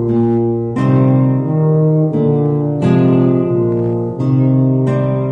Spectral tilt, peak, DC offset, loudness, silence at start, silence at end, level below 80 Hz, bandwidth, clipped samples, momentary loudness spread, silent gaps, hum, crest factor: -11 dB/octave; 0 dBFS; under 0.1%; -14 LUFS; 0 s; 0 s; -46 dBFS; 4 kHz; under 0.1%; 4 LU; none; none; 12 dB